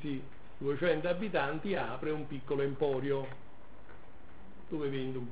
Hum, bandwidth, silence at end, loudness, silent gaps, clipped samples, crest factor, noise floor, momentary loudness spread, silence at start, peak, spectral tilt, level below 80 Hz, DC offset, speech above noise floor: none; 4 kHz; 0 s; -35 LUFS; none; under 0.1%; 20 dB; -56 dBFS; 22 LU; 0 s; -16 dBFS; -5 dB/octave; -62 dBFS; 1%; 21 dB